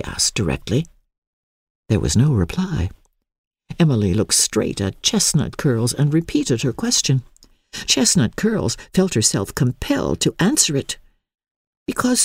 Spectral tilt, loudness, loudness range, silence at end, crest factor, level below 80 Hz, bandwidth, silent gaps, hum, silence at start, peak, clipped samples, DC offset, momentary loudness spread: -4 dB/octave; -19 LUFS; 3 LU; 0 s; 18 dB; -40 dBFS; 16 kHz; 1.18-1.83 s, 3.38-3.51 s, 11.51-11.86 s; none; 0 s; -2 dBFS; under 0.1%; under 0.1%; 9 LU